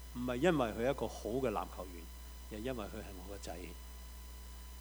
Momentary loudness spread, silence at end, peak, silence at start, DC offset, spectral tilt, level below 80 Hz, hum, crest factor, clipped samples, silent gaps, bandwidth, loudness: 18 LU; 0 s; -16 dBFS; 0 s; under 0.1%; -5.5 dB/octave; -50 dBFS; none; 24 dB; under 0.1%; none; over 20 kHz; -39 LUFS